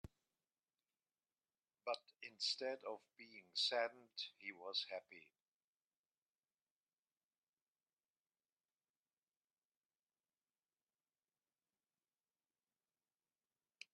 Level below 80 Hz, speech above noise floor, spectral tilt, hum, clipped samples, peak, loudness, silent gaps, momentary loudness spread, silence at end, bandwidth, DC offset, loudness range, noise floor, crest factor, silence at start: -84 dBFS; over 43 dB; -1.5 dB/octave; none; under 0.1%; -28 dBFS; -45 LUFS; none; 21 LU; 8.7 s; 10 kHz; under 0.1%; 8 LU; under -90 dBFS; 24 dB; 0.05 s